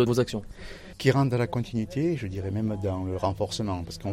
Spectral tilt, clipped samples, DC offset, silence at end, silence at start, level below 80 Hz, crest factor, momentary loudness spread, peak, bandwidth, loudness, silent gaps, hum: -6.5 dB/octave; under 0.1%; under 0.1%; 0 s; 0 s; -48 dBFS; 20 dB; 10 LU; -8 dBFS; 15.5 kHz; -28 LUFS; none; none